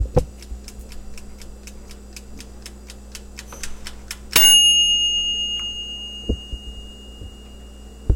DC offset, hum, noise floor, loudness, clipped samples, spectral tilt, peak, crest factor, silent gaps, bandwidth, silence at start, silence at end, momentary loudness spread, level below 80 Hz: under 0.1%; none; -39 dBFS; -15 LUFS; under 0.1%; -1 dB/octave; 0 dBFS; 22 dB; none; 17 kHz; 0 s; 0 s; 29 LU; -32 dBFS